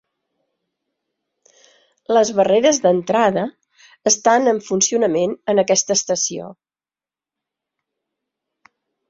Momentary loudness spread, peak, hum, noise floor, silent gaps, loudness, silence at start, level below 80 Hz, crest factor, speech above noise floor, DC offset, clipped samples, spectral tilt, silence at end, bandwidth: 9 LU; -2 dBFS; none; under -90 dBFS; none; -17 LUFS; 2.1 s; -64 dBFS; 18 dB; over 73 dB; under 0.1%; under 0.1%; -3 dB/octave; 2.55 s; 7.8 kHz